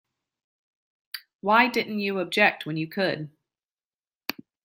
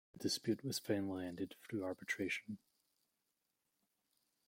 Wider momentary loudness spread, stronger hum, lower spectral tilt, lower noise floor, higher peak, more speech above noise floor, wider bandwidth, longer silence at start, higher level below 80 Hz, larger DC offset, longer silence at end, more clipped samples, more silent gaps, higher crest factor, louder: first, 20 LU vs 7 LU; neither; about the same, -5 dB/octave vs -4 dB/octave; about the same, under -90 dBFS vs -87 dBFS; first, -4 dBFS vs -24 dBFS; first, over 66 dB vs 45 dB; about the same, 16.5 kHz vs 16.5 kHz; first, 1.15 s vs 0.15 s; first, -76 dBFS vs -82 dBFS; neither; second, 0.35 s vs 1.9 s; neither; first, 1.35-1.39 s, 3.64-3.76 s, 3.84-3.91 s, 3.99-4.04 s vs none; about the same, 24 dB vs 22 dB; first, -24 LUFS vs -42 LUFS